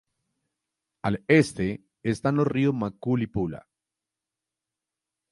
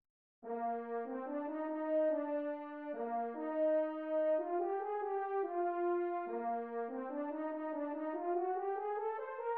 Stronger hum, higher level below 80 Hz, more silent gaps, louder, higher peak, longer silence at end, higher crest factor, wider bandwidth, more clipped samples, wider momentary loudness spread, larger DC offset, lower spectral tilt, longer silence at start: neither; first, -54 dBFS vs under -90 dBFS; neither; first, -26 LUFS vs -38 LUFS; first, -6 dBFS vs -26 dBFS; first, 1.75 s vs 0 s; first, 22 dB vs 12 dB; first, 11.5 kHz vs 4 kHz; neither; first, 12 LU vs 7 LU; neither; first, -7 dB/octave vs -4 dB/octave; first, 1.05 s vs 0.4 s